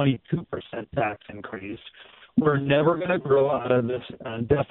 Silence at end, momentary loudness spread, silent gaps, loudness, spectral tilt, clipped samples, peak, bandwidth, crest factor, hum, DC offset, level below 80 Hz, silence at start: 0.05 s; 16 LU; none; -25 LUFS; -6 dB/octave; under 0.1%; -6 dBFS; 4.1 kHz; 18 dB; none; under 0.1%; -54 dBFS; 0 s